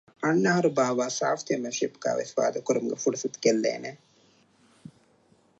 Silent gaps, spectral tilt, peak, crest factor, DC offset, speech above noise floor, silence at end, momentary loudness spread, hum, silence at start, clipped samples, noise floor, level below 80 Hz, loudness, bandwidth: none; -4.5 dB/octave; -8 dBFS; 20 dB; under 0.1%; 37 dB; 1.65 s; 7 LU; none; 0.2 s; under 0.1%; -63 dBFS; -78 dBFS; -27 LUFS; 8.2 kHz